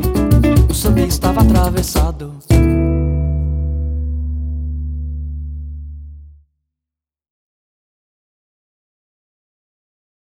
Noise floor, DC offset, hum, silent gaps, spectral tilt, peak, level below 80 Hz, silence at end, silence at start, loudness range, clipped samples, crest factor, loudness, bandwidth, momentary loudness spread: -85 dBFS; under 0.1%; none; none; -6.5 dB/octave; 0 dBFS; -20 dBFS; 4 s; 0 s; 18 LU; under 0.1%; 16 dB; -16 LUFS; 17 kHz; 16 LU